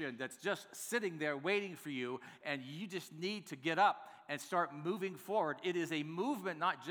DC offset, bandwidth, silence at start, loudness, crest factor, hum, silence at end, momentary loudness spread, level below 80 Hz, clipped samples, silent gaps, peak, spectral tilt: under 0.1%; over 20 kHz; 0 s; -39 LUFS; 20 dB; none; 0 s; 10 LU; under -90 dBFS; under 0.1%; none; -18 dBFS; -4.5 dB/octave